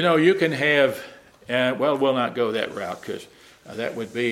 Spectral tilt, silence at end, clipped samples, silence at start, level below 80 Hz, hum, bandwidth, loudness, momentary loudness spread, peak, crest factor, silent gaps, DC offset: -5.5 dB/octave; 0 s; under 0.1%; 0 s; -66 dBFS; none; 15.5 kHz; -22 LUFS; 17 LU; -6 dBFS; 18 dB; none; under 0.1%